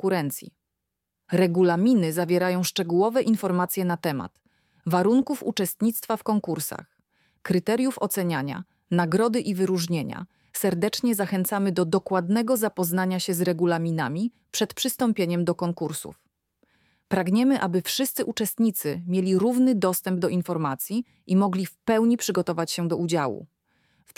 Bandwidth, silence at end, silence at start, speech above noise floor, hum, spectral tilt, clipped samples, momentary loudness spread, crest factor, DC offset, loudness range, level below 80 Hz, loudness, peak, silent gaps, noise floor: 17.5 kHz; 0.75 s; 0.05 s; 59 dB; none; -5.5 dB/octave; under 0.1%; 9 LU; 16 dB; under 0.1%; 3 LU; -68 dBFS; -25 LUFS; -8 dBFS; none; -83 dBFS